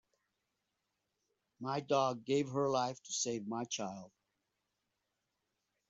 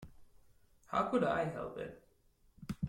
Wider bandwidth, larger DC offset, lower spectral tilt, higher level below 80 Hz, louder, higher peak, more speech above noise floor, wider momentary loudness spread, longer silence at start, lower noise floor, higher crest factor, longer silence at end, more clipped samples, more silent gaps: second, 8 kHz vs 16 kHz; neither; second, -4.5 dB/octave vs -7 dB/octave; second, -82 dBFS vs -64 dBFS; about the same, -37 LUFS vs -36 LUFS; about the same, -20 dBFS vs -20 dBFS; first, 50 dB vs 34 dB; second, 9 LU vs 15 LU; first, 1.6 s vs 0 s; first, -86 dBFS vs -69 dBFS; about the same, 20 dB vs 18 dB; first, 1.8 s vs 0 s; neither; neither